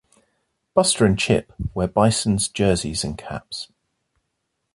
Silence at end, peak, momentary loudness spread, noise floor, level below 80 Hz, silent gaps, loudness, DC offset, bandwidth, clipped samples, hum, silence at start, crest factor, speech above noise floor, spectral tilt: 1.1 s; -4 dBFS; 15 LU; -76 dBFS; -42 dBFS; none; -21 LUFS; under 0.1%; 11.5 kHz; under 0.1%; none; 0.75 s; 20 dB; 55 dB; -4.5 dB/octave